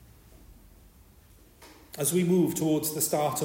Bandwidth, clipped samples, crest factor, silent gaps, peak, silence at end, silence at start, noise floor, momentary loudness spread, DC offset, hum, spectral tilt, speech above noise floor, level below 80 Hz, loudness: 16.5 kHz; under 0.1%; 16 dB; none; -12 dBFS; 0 s; 0.5 s; -56 dBFS; 5 LU; under 0.1%; none; -5 dB/octave; 30 dB; -58 dBFS; -26 LUFS